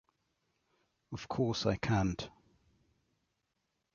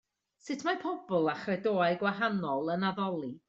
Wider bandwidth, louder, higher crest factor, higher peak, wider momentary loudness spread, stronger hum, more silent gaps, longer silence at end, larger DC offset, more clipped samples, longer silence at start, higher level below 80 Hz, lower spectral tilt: about the same, 7.2 kHz vs 7.8 kHz; about the same, -34 LUFS vs -32 LUFS; first, 22 dB vs 16 dB; about the same, -16 dBFS vs -16 dBFS; first, 16 LU vs 6 LU; neither; neither; first, 1.65 s vs 0.1 s; neither; neither; first, 1.1 s vs 0.45 s; first, -56 dBFS vs -74 dBFS; about the same, -5.5 dB/octave vs -6 dB/octave